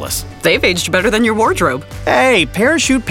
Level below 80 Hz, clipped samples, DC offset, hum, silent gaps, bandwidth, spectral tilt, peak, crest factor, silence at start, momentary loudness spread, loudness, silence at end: -34 dBFS; under 0.1%; under 0.1%; none; none; 17 kHz; -3.5 dB/octave; 0 dBFS; 14 dB; 0 s; 6 LU; -13 LUFS; 0 s